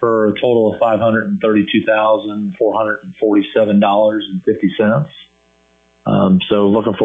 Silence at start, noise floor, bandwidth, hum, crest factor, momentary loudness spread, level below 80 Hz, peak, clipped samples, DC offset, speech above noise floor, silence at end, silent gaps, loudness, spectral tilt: 0 s; -54 dBFS; 3.9 kHz; none; 12 dB; 6 LU; -56 dBFS; -2 dBFS; under 0.1%; under 0.1%; 40 dB; 0 s; none; -14 LUFS; -9 dB/octave